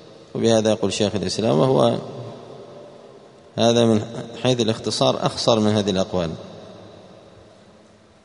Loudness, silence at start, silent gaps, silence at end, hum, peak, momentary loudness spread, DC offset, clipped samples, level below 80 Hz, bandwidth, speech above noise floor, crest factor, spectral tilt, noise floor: -20 LUFS; 0.1 s; none; 1.25 s; none; -2 dBFS; 22 LU; under 0.1%; under 0.1%; -56 dBFS; 10.5 kHz; 31 dB; 20 dB; -5.5 dB/octave; -51 dBFS